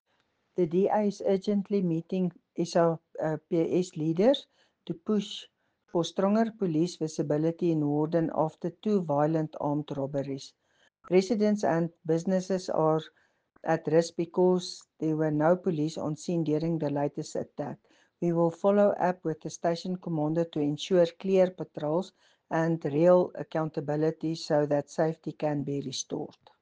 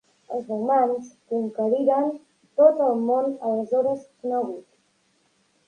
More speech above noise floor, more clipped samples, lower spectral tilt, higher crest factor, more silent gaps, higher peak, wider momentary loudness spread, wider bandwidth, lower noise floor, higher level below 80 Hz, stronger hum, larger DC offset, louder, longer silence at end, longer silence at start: about the same, 46 dB vs 44 dB; neither; second, -6.5 dB/octave vs -8 dB/octave; about the same, 18 dB vs 20 dB; neither; second, -10 dBFS vs -4 dBFS; second, 9 LU vs 14 LU; about the same, 9.6 kHz vs 9.6 kHz; first, -74 dBFS vs -66 dBFS; about the same, -72 dBFS vs -76 dBFS; neither; neither; second, -29 LUFS vs -23 LUFS; second, 0.35 s vs 1.05 s; first, 0.6 s vs 0.3 s